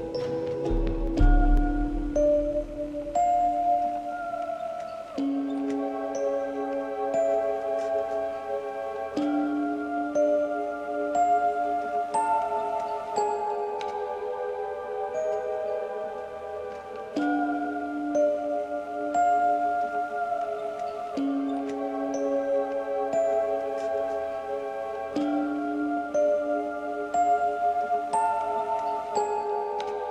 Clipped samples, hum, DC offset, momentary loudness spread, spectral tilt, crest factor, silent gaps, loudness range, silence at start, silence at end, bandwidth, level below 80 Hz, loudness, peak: under 0.1%; none; under 0.1%; 8 LU; -6.5 dB/octave; 18 dB; none; 4 LU; 0 s; 0 s; 9.8 kHz; -36 dBFS; -28 LUFS; -10 dBFS